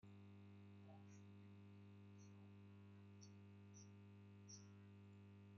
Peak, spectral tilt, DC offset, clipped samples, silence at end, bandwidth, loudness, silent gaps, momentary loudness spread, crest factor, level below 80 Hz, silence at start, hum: -48 dBFS; -6.5 dB/octave; under 0.1%; under 0.1%; 0 s; 6.6 kHz; -64 LUFS; none; 3 LU; 16 dB; under -90 dBFS; 0 s; 50 Hz at -65 dBFS